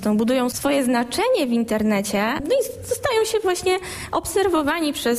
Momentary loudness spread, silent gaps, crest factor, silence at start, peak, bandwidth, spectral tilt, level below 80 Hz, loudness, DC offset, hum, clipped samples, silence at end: 4 LU; none; 12 dB; 0 s; -8 dBFS; 15 kHz; -4 dB/octave; -48 dBFS; -21 LUFS; under 0.1%; none; under 0.1%; 0 s